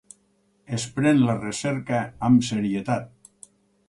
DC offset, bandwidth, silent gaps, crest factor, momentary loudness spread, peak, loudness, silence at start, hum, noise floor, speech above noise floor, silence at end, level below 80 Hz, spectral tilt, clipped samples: under 0.1%; 11.5 kHz; none; 16 dB; 9 LU; -8 dBFS; -23 LUFS; 0.7 s; none; -65 dBFS; 43 dB; 0.8 s; -58 dBFS; -6 dB/octave; under 0.1%